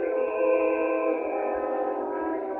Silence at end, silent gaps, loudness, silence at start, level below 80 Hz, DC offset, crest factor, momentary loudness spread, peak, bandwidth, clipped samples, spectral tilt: 0 s; none; -27 LUFS; 0 s; -64 dBFS; under 0.1%; 14 dB; 6 LU; -12 dBFS; 3.3 kHz; under 0.1%; -8 dB/octave